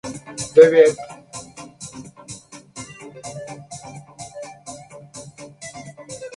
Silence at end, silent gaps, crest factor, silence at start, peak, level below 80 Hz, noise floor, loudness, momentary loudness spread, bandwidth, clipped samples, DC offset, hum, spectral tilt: 0.1 s; none; 22 dB; 0.05 s; 0 dBFS; -60 dBFS; -40 dBFS; -14 LUFS; 26 LU; 11.5 kHz; under 0.1%; under 0.1%; none; -4 dB/octave